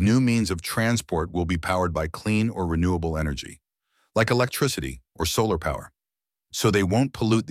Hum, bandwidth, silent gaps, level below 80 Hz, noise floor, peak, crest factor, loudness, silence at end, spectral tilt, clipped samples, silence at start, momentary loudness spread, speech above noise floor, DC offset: none; 16 kHz; none; -40 dBFS; under -90 dBFS; -6 dBFS; 18 dB; -24 LUFS; 0 s; -5.5 dB/octave; under 0.1%; 0 s; 9 LU; over 66 dB; under 0.1%